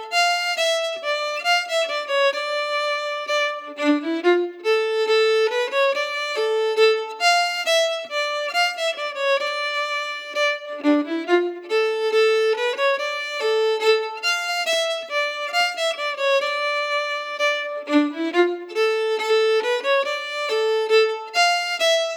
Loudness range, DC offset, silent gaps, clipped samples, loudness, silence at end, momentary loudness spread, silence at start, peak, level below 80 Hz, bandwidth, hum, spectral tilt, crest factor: 2 LU; under 0.1%; none; under 0.1%; -21 LUFS; 0 s; 5 LU; 0 s; -6 dBFS; under -90 dBFS; 18 kHz; none; 0.5 dB/octave; 14 dB